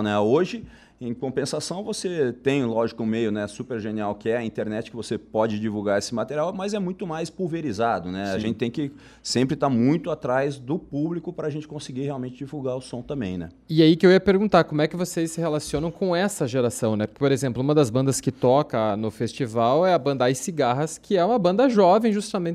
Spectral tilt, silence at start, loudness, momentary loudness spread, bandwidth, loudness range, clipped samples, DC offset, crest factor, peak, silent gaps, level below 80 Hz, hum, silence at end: -6 dB/octave; 0 s; -24 LUFS; 12 LU; 14.5 kHz; 6 LU; under 0.1%; under 0.1%; 20 dB; -4 dBFS; none; -56 dBFS; none; 0 s